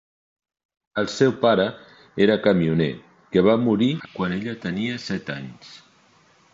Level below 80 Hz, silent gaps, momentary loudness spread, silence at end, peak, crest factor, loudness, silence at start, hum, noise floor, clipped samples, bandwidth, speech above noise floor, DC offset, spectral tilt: -56 dBFS; none; 14 LU; 0.8 s; -6 dBFS; 18 dB; -22 LUFS; 0.95 s; none; -57 dBFS; under 0.1%; 7.8 kHz; 36 dB; under 0.1%; -6.5 dB/octave